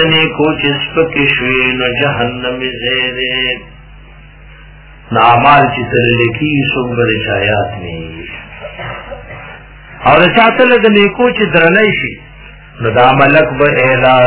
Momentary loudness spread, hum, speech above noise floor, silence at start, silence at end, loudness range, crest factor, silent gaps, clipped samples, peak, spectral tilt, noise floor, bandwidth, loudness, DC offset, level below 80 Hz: 18 LU; none; 25 dB; 0 s; 0 s; 7 LU; 12 dB; none; 0.6%; 0 dBFS; -9 dB/octave; -35 dBFS; 4 kHz; -10 LUFS; under 0.1%; -36 dBFS